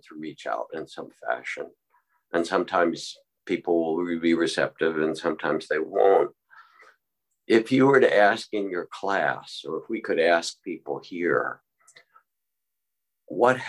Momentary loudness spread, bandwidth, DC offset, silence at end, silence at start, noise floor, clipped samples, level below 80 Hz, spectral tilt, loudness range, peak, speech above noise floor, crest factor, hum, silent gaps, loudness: 16 LU; 12 kHz; under 0.1%; 0 s; 0.1 s; -84 dBFS; under 0.1%; -70 dBFS; -5 dB/octave; 7 LU; -6 dBFS; 60 dB; 20 dB; none; none; -25 LUFS